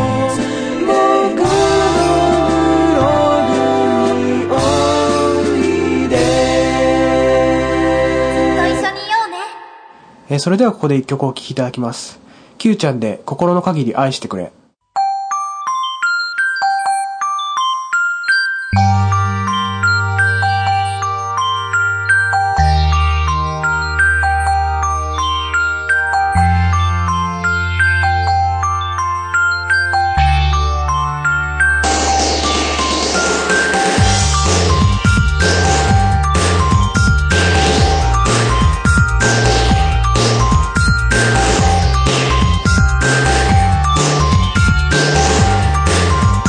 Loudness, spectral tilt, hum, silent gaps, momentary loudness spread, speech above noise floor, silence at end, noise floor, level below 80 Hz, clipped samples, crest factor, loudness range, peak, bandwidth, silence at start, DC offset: -14 LUFS; -4.5 dB/octave; none; none; 6 LU; 25 dB; 0 s; -41 dBFS; -22 dBFS; under 0.1%; 12 dB; 5 LU; 0 dBFS; 10.5 kHz; 0 s; under 0.1%